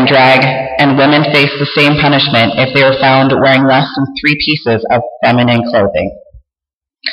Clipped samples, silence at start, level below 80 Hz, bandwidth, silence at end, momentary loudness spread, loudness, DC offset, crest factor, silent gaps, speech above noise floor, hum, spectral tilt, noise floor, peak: under 0.1%; 0 s; -42 dBFS; 12 kHz; 0 s; 6 LU; -9 LUFS; under 0.1%; 10 dB; 6.73-6.81 s; 77 dB; none; -7 dB/octave; -87 dBFS; 0 dBFS